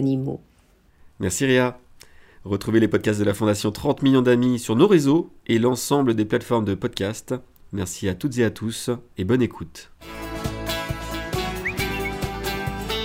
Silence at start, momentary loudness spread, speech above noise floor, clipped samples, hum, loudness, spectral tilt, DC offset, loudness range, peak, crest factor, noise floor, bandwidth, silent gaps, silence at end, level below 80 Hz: 0 s; 13 LU; 36 dB; under 0.1%; none; -23 LUFS; -5.5 dB/octave; under 0.1%; 7 LU; -2 dBFS; 20 dB; -57 dBFS; 16 kHz; none; 0 s; -42 dBFS